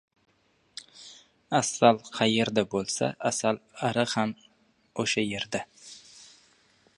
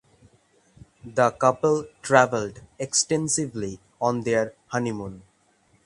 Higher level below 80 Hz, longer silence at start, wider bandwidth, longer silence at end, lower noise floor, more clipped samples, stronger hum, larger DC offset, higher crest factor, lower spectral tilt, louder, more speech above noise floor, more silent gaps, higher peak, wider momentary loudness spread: second, -68 dBFS vs -58 dBFS; about the same, 0.95 s vs 1.05 s; about the same, 11.5 kHz vs 11.5 kHz; about the same, 0.75 s vs 0.65 s; first, -68 dBFS vs -63 dBFS; neither; neither; neither; about the same, 26 dB vs 24 dB; about the same, -3.5 dB/octave vs -4 dB/octave; second, -27 LUFS vs -24 LUFS; about the same, 41 dB vs 39 dB; neither; about the same, -4 dBFS vs -2 dBFS; first, 24 LU vs 15 LU